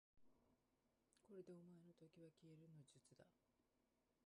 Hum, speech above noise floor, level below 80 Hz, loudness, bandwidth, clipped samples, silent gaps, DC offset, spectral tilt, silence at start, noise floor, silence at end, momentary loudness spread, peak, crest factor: none; 20 dB; under -90 dBFS; -66 LUFS; 11 kHz; under 0.1%; none; under 0.1%; -6.5 dB/octave; 0.15 s; -88 dBFS; 0 s; 6 LU; -50 dBFS; 18 dB